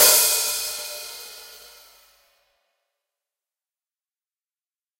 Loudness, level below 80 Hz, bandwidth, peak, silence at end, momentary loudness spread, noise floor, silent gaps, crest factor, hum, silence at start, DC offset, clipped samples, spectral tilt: -19 LUFS; -64 dBFS; 16 kHz; -2 dBFS; 3.45 s; 25 LU; under -90 dBFS; none; 24 dB; none; 0 s; under 0.1%; under 0.1%; 2.5 dB/octave